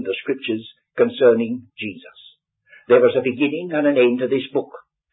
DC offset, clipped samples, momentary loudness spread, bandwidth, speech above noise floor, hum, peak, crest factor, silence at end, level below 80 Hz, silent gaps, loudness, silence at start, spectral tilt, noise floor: under 0.1%; under 0.1%; 15 LU; 4 kHz; 34 dB; none; -2 dBFS; 18 dB; 0.35 s; -68 dBFS; none; -19 LUFS; 0 s; -10.5 dB/octave; -52 dBFS